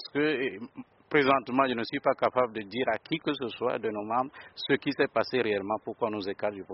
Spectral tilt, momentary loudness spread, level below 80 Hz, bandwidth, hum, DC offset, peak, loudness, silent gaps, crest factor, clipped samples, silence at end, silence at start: -3 dB/octave; 9 LU; -68 dBFS; 5.8 kHz; none; under 0.1%; -8 dBFS; -29 LUFS; none; 20 dB; under 0.1%; 0 s; 0 s